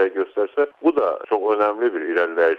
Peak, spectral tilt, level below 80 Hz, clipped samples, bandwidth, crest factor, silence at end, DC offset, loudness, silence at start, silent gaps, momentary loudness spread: -6 dBFS; -6 dB/octave; -70 dBFS; under 0.1%; 5.2 kHz; 14 dB; 0 s; under 0.1%; -21 LUFS; 0 s; none; 4 LU